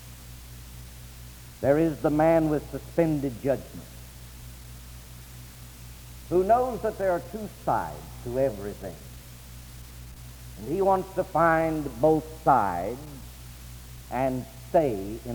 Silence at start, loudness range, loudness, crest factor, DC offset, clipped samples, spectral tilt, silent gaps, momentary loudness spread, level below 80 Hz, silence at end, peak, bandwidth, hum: 0 s; 7 LU; -26 LUFS; 20 dB; under 0.1%; under 0.1%; -6.5 dB/octave; none; 22 LU; -46 dBFS; 0 s; -8 dBFS; over 20 kHz; none